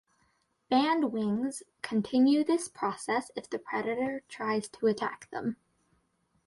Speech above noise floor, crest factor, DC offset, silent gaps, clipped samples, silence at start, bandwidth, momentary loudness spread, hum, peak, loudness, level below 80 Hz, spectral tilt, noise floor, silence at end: 43 dB; 18 dB; under 0.1%; none; under 0.1%; 0.7 s; 11.5 kHz; 11 LU; none; -14 dBFS; -31 LUFS; -72 dBFS; -5 dB/octave; -73 dBFS; 0.9 s